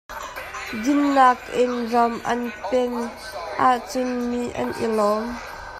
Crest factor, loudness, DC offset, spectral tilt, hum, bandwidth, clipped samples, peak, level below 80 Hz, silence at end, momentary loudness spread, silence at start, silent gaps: 20 dB; -22 LUFS; under 0.1%; -4.5 dB/octave; none; 15 kHz; under 0.1%; -2 dBFS; -50 dBFS; 0 s; 14 LU; 0.1 s; none